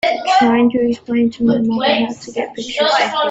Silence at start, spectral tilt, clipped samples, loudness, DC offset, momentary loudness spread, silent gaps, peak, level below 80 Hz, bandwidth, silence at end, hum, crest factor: 0.05 s; -4.5 dB/octave; under 0.1%; -16 LUFS; under 0.1%; 10 LU; none; -2 dBFS; -54 dBFS; 8 kHz; 0 s; none; 12 dB